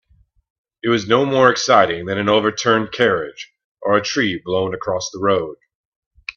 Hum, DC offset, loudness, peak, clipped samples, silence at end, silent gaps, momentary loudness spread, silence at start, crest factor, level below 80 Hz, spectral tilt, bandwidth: none; under 0.1%; -17 LUFS; 0 dBFS; under 0.1%; 0.05 s; 3.64-3.75 s, 5.75-6.11 s; 13 LU; 0.85 s; 18 dB; -56 dBFS; -4 dB/octave; 7.4 kHz